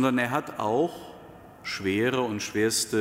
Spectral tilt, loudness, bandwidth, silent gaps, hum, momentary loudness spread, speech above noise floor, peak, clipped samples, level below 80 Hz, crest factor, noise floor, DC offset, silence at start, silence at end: -4 dB/octave; -27 LUFS; 16 kHz; none; none; 17 LU; 21 dB; -10 dBFS; under 0.1%; -62 dBFS; 16 dB; -47 dBFS; under 0.1%; 0 s; 0 s